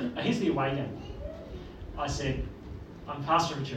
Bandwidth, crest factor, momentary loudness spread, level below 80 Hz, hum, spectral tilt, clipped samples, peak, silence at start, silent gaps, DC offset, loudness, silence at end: 14.5 kHz; 20 dB; 17 LU; -46 dBFS; none; -5.5 dB/octave; under 0.1%; -12 dBFS; 0 s; none; under 0.1%; -31 LUFS; 0 s